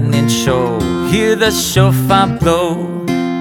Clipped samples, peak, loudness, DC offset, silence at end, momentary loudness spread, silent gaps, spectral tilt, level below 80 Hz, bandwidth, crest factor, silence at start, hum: under 0.1%; 0 dBFS; -13 LUFS; under 0.1%; 0 s; 6 LU; none; -5 dB/octave; -34 dBFS; 19 kHz; 12 dB; 0 s; none